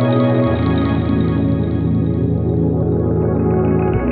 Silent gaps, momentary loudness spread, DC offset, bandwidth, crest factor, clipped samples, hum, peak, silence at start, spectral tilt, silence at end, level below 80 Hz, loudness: none; 2 LU; under 0.1%; 4.6 kHz; 12 dB; under 0.1%; none; -4 dBFS; 0 s; -12.5 dB/octave; 0 s; -30 dBFS; -16 LUFS